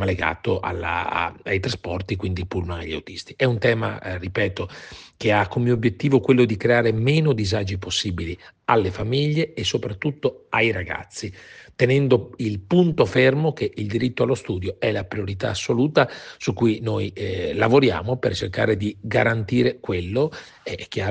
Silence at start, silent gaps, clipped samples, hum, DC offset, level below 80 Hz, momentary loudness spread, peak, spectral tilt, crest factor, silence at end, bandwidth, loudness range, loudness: 0 s; none; under 0.1%; none; under 0.1%; -50 dBFS; 12 LU; -4 dBFS; -6 dB/octave; 18 dB; 0 s; 9.6 kHz; 4 LU; -22 LUFS